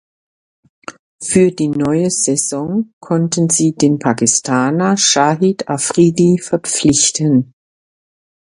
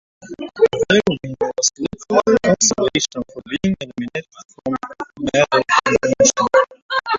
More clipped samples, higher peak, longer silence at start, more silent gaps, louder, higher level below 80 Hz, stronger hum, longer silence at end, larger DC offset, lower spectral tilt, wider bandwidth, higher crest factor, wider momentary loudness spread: neither; about the same, 0 dBFS vs -2 dBFS; first, 0.9 s vs 0.25 s; first, 0.99-1.19 s, 2.93-3.01 s vs 4.45-4.49 s, 6.82-6.89 s; first, -14 LUFS vs -17 LUFS; about the same, -52 dBFS vs -50 dBFS; neither; first, 1.1 s vs 0 s; neither; about the same, -4 dB/octave vs -3 dB/octave; first, 11.5 kHz vs 7.8 kHz; about the same, 16 dB vs 16 dB; second, 9 LU vs 14 LU